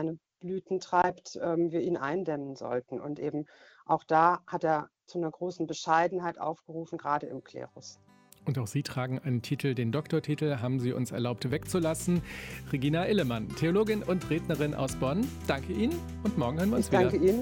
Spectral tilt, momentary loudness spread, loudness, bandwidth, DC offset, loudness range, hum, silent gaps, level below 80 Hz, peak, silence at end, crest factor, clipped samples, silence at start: -6.5 dB/octave; 12 LU; -31 LUFS; 17 kHz; under 0.1%; 4 LU; none; none; -54 dBFS; -10 dBFS; 0 s; 20 dB; under 0.1%; 0 s